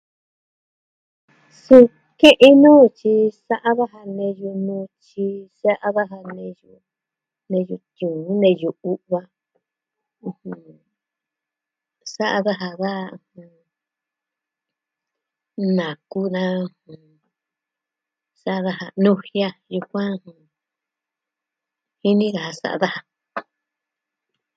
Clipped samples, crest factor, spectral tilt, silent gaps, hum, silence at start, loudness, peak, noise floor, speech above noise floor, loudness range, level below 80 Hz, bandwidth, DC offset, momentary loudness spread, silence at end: under 0.1%; 20 dB; -6.5 dB/octave; none; none; 1.7 s; -18 LUFS; 0 dBFS; -86 dBFS; 68 dB; 15 LU; -64 dBFS; 10 kHz; under 0.1%; 23 LU; 1.15 s